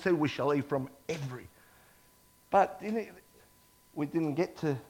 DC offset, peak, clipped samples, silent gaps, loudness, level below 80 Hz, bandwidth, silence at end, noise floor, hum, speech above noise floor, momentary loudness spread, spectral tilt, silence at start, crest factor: under 0.1%; -12 dBFS; under 0.1%; none; -32 LUFS; -68 dBFS; 17 kHz; 0.05 s; -63 dBFS; none; 32 dB; 14 LU; -7 dB/octave; 0 s; 22 dB